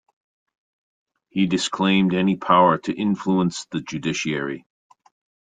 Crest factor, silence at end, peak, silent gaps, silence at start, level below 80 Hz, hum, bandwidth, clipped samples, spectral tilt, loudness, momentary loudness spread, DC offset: 20 dB; 0.95 s; -4 dBFS; none; 1.35 s; -60 dBFS; none; 9.4 kHz; under 0.1%; -5.5 dB/octave; -21 LUFS; 13 LU; under 0.1%